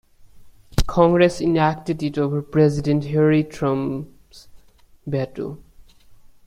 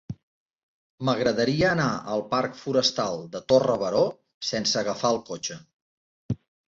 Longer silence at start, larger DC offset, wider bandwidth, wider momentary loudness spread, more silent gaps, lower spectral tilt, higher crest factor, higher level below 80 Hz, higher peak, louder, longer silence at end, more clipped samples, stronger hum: first, 0.35 s vs 0.1 s; neither; first, 14 kHz vs 7.8 kHz; about the same, 15 LU vs 13 LU; second, none vs 0.23-0.98 s, 4.34-4.41 s, 5.73-6.29 s; first, -7.5 dB/octave vs -4.5 dB/octave; about the same, 20 dB vs 18 dB; first, -36 dBFS vs -58 dBFS; first, -2 dBFS vs -8 dBFS; first, -20 LUFS vs -25 LUFS; first, 0.9 s vs 0.35 s; neither; neither